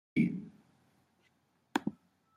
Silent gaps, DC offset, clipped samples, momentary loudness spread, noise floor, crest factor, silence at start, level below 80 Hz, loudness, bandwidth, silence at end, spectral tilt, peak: none; under 0.1%; under 0.1%; 13 LU; -74 dBFS; 24 dB; 0.15 s; -74 dBFS; -36 LUFS; 14 kHz; 0.45 s; -6.5 dB/octave; -14 dBFS